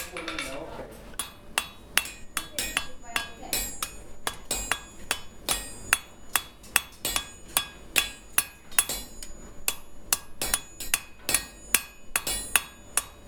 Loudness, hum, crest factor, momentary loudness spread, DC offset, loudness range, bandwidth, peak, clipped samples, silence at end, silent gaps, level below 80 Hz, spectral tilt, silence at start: -29 LUFS; none; 30 dB; 10 LU; under 0.1%; 4 LU; 19.5 kHz; -2 dBFS; under 0.1%; 0 s; none; -48 dBFS; 0 dB/octave; 0 s